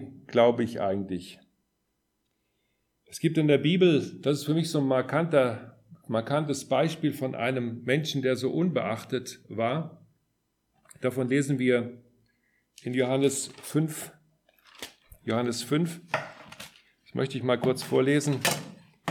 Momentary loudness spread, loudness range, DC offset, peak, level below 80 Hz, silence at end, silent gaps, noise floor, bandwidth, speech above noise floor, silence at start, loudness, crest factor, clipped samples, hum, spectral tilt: 18 LU; 6 LU; under 0.1%; -8 dBFS; -72 dBFS; 0 s; none; -77 dBFS; 19 kHz; 51 dB; 0 s; -27 LUFS; 20 dB; under 0.1%; none; -5.5 dB/octave